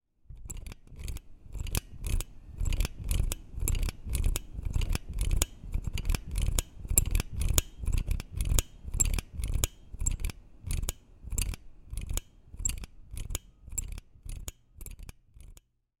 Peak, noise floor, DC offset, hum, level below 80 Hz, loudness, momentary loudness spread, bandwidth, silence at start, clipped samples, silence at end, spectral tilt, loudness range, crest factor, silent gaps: -2 dBFS; -55 dBFS; under 0.1%; none; -34 dBFS; -34 LUFS; 17 LU; 17 kHz; 0.3 s; under 0.1%; 0.45 s; -3.5 dB/octave; 8 LU; 30 dB; none